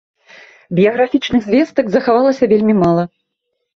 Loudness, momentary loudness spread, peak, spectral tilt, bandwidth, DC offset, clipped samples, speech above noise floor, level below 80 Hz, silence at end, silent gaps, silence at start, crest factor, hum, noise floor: -14 LUFS; 5 LU; -2 dBFS; -7.5 dB/octave; 7.2 kHz; under 0.1%; under 0.1%; 60 dB; -50 dBFS; 0.7 s; none; 0.7 s; 14 dB; none; -73 dBFS